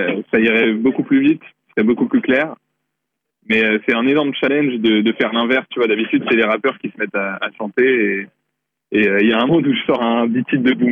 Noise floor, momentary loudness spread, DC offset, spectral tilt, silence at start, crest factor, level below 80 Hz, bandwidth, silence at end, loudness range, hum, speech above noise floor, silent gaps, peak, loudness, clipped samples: -78 dBFS; 7 LU; under 0.1%; -8 dB/octave; 0 s; 10 dB; -60 dBFS; 4.7 kHz; 0 s; 2 LU; none; 62 dB; none; -6 dBFS; -16 LUFS; under 0.1%